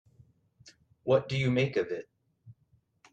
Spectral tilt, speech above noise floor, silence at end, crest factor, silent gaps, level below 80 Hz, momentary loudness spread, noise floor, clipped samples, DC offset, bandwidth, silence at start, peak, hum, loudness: -7 dB/octave; 42 dB; 0.6 s; 20 dB; none; -64 dBFS; 12 LU; -70 dBFS; under 0.1%; under 0.1%; 8.6 kHz; 1.05 s; -12 dBFS; none; -30 LUFS